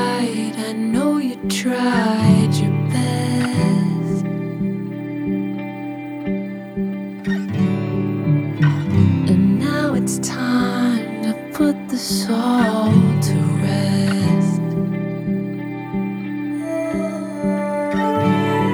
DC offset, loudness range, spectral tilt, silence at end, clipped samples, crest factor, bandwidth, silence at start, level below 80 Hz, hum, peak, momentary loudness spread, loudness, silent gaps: under 0.1%; 6 LU; -6.5 dB/octave; 0 s; under 0.1%; 16 dB; over 20 kHz; 0 s; -50 dBFS; none; -2 dBFS; 10 LU; -19 LUFS; none